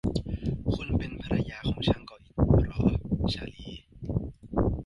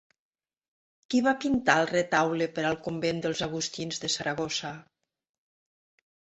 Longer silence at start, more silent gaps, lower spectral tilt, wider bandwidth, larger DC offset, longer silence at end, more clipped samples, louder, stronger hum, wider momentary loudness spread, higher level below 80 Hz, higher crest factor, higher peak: second, 0.05 s vs 1.1 s; neither; first, -8 dB/octave vs -4 dB/octave; first, 11 kHz vs 8.2 kHz; neither; second, 0 s vs 1.5 s; neither; about the same, -29 LUFS vs -28 LUFS; neither; first, 14 LU vs 8 LU; first, -36 dBFS vs -62 dBFS; second, 18 dB vs 24 dB; second, -10 dBFS vs -6 dBFS